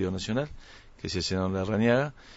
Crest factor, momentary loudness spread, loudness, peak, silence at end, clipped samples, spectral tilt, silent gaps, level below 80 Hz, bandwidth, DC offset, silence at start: 16 dB; 11 LU; -28 LUFS; -12 dBFS; 0 s; under 0.1%; -5.5 dB/octave; none; -50 dBFS; 8 kHz; under 0.1%; 0 s